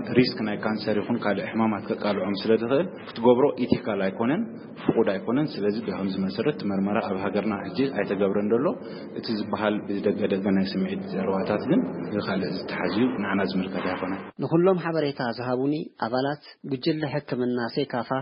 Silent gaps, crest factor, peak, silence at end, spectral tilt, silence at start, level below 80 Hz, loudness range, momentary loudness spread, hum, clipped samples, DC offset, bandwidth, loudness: none; 20 dB; -6 dBFS; 0 s; -11 dB/octave; 0 s; -64 dBFS; 2 LU; 7 LU; none; under 0.1%; under 0.1%; 5.4 kHz; -26 LUFS